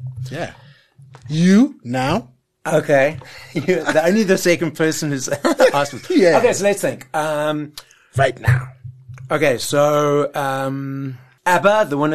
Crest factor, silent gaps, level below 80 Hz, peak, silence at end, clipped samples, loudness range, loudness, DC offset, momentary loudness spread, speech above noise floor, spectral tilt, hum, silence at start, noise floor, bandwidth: 16 dB; none; -52 dBFS; -2 dBFS; 0 s; under 0.1%; 3 LU; -17 LUFS; 0.5%; 14 LU; 19 dB; -5.5 dB/octave; none; 0 s; -36 dBFS; 13 kHz